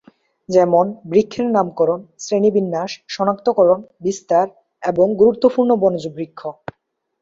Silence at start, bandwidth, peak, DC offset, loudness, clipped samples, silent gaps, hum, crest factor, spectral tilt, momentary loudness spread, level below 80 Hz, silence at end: 0.5 s; 7.8 kHz; -2 dBFS; under 0.1%; -17 LUFS; under 0.1%; none; none; 16 dB; -6.5 dB/octave; 14 LU; -58 dBFS; 0.7 s